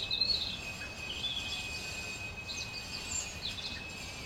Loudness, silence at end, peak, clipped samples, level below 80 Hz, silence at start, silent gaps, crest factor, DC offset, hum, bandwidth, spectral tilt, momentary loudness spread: -36 LUFS; 0 s; -18 dBFS; under 0.1%; -54 dBFS; 0 s; none; 20 dB; under 0.1%; none; 16.5 kHz; -1.5 dB/octave; 10 LU